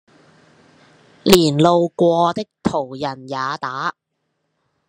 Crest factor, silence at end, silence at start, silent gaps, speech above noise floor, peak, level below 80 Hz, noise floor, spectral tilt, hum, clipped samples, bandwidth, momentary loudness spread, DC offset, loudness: 20 dB; 0.95 s; 1.25 s; none; 55 dB; 0 dBFS; -50 dBFS; -72 dBFS; -5 dB/octave; none; under 0.1%; 12.5 kHz; 12 LU; under 0.1%; -18 LUFS